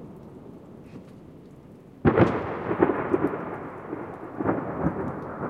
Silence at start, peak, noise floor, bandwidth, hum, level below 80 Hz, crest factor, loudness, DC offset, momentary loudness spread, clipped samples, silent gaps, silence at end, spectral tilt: 0 s; -6 dBFS; -47 dBFS; 7.2 kHz; none; -52 dBFS; 22 dB; -27 LUFS; under 0.1%; 24 LU; under 0.1%; none; 0 s; -9.5 dB/octave